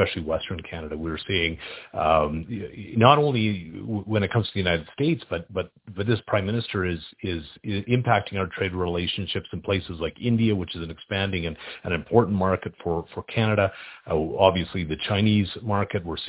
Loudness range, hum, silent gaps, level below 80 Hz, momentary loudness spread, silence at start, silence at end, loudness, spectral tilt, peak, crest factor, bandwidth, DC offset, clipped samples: 4 LU; none; none; -44 dBFS; 12 LU; 0 s; 0 s; -25 LUFS; -10.5 dB/octave; 0 dBFS; 24 dB; 4 kHz; under 0.1%; under 0.1%